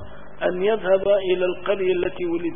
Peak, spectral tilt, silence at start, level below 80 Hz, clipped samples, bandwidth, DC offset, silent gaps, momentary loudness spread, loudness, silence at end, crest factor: -8 dBFS; -10.5 dB/octave; 0 s; -50 dBFS; under 0.1%; 3.7 kHz; 2%; none; 7 LU; -22 LUFS; 0 s; 14 dB